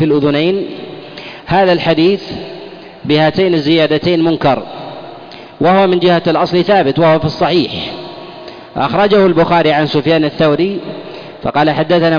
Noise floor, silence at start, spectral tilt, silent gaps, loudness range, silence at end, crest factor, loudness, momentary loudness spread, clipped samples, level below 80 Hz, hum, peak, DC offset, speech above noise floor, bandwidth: -32 dBFS; 0 s; -7.5 dB/octave; none; 2 LU; 0 s; 10 dB; -12 LUFS; 19 LU; under 0.1%; -44 dBFS; none; -2 dBFS; under 0.1%; 21 dB; 5.2 kHz